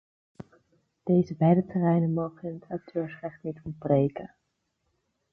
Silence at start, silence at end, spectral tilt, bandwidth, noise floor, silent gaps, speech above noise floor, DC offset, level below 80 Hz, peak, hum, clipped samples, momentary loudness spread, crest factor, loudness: 0.4 s; 1.05 s; -11 dB/octave; 5.6 kHz; -77 dBFS; none; 51 dB; under 0.1%; -62 dBFS; -10 dBFS; none; under 0.1%; 16 LU; 18 dB; -27 LUFS